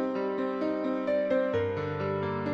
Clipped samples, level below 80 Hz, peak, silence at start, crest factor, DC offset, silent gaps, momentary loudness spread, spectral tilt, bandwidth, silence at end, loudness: under 0.1%; -64 dBFS; -16 dBFS; 0 s; 14 dB; under 0.1%; none; 4 LU; -8.5 dB/octave; 7.4 kHz; 0 s; -30 LUFS